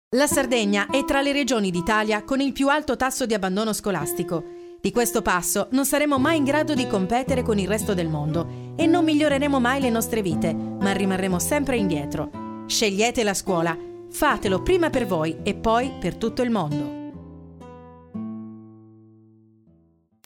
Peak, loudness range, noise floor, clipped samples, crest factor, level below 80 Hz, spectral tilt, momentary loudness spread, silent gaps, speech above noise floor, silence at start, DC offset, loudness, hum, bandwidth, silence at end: -6 dBFS; 5 LU; -61 dBFS; under 0.1%; 16 dB; -46 dBFS; -4.5 dB/octave; 13 LU; none; 39 dB; 0.1 s; under 0.1%; -22 LUFS; none; 17.5 kHz; 1.45 s